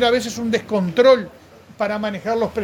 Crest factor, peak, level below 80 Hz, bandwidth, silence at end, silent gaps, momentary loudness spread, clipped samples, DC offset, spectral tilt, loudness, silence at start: 18 dB; -2 dBFS; -52 dBFS; 17.5 kHz; 0 s; none; 10 LU; under 0.1%; under 0.1%; -5 dB/octave; -19 LUFS; 0 s